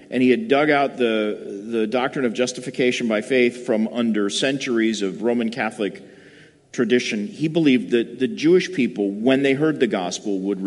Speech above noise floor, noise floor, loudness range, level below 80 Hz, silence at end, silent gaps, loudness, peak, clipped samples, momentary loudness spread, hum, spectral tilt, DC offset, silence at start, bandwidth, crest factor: 28 dB; -49 dBFS; 3 LU; -70 dBFS; 0 s; none; -21 LUFS; -4 dBFS; under 0.1%; 7 LU; none; -5 dB/octave; under 0.1%; 0 s; 11.5 kHz; 16 dB